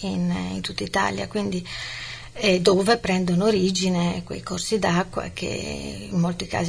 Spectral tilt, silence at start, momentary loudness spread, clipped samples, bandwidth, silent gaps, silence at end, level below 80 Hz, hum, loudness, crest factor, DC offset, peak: -5 dB/octave; 0 s; 12 LU; under 0.1%; 11 kHz; none; 0 s; -46 dBFS; none; -24 LUFS; 18 dB; 0.2%; -6 dBFS